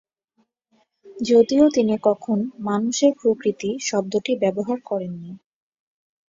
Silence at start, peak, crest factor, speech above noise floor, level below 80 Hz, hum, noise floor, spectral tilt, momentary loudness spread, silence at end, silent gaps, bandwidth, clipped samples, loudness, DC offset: 1.05 s; -4 dBFS; 18 dB; 48 dB; -64 dBFS; none; -69 dBFS; -5 dB/octave; 11 LU; 0.95 s; none; 7.8 kHz; under 0.1%; -21 LUFS; under 0.1%